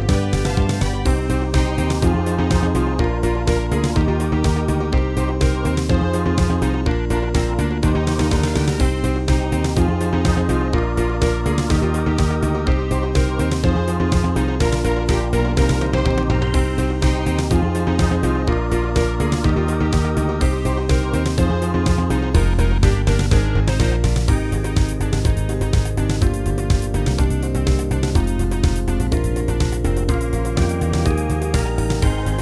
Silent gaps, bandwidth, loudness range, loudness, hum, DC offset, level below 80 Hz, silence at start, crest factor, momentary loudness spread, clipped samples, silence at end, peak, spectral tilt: none; 11 kHz; 2 LU; -19 LUFS; none; 0.2%; -22 dBFS; 0 s; 14 dB; 2 LU; under 0.1%; 0 s; -2 dBFS; -6.5 dB/octave